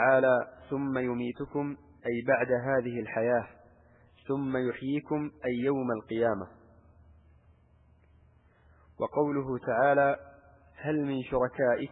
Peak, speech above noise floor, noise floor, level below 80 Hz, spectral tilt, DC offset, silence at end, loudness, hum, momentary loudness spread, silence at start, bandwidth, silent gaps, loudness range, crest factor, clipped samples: -12 dBFS; 33 dB; -62 dBFS; -62 dBFS; -10.5 dB/octave; under 0.1%; 0.05 s; -30 LUFS; none; 11 LU; 0 s; 4 kHz; none; 7 LU; 20 dB; under 0.1%